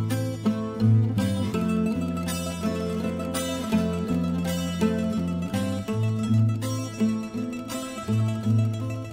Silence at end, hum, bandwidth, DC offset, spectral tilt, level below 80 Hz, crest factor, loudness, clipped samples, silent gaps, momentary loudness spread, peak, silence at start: 0 s; none; 16 kHz; under 0.1%; -6.5 dB/octave; -50 dBFS; 14 dB; -26 LUFS; under 0.1%; none; 6 LU; -10 dBFS; 0 s